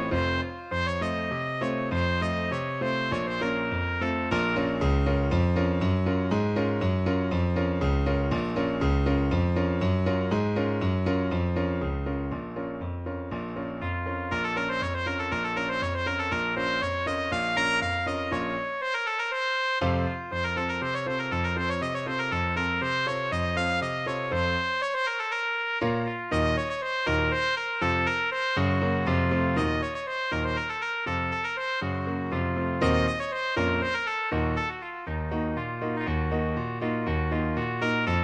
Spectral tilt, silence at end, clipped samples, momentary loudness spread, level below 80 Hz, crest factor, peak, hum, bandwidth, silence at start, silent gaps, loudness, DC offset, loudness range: -6.5 dB/octave; 0 s; under 0.1%; 5 LU; -38 dBFS; 16 dB; -10 dBFS; none; 9.6 kHz; 0 s; none; -27 LUFS; under 0.1%; 3 LU